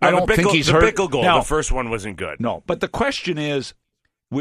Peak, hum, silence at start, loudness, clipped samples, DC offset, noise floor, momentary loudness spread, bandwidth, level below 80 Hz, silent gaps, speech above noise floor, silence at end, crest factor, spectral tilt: -2 dBFS; none; 0 s; -19 LUFS; under 0.1%; under 0.1%; -73 dBFS; 11 LU; 14 kHz; -32 dBFS; none; 54 dB; 0 s; 18 dB; -4.5 dB/octave